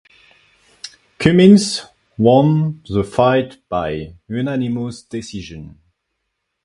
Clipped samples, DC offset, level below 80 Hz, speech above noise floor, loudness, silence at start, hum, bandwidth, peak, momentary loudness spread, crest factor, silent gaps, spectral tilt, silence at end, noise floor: under 0.1%; under 0.1%; -46 dBFS; 59 dB; -16 LUFS; 0.85 s; none; 11.5 kHz; 0 dBFS; 25 LU; 18 dB; none; -6.5 dB/octave; 0.95 s; -74 dBFS